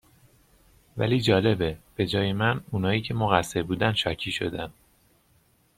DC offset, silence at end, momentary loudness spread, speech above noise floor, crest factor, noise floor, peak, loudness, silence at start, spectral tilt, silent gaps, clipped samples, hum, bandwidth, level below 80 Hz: under 0.1%; 1.05 s; 9 LU; 39 dB; 24 dB; -64 dBFS; -2 dBFS; -26 LUFS; 0.95 s; -6 dB/octave; none; under 0.1%; none; 15.5 kHz; -52 dBFS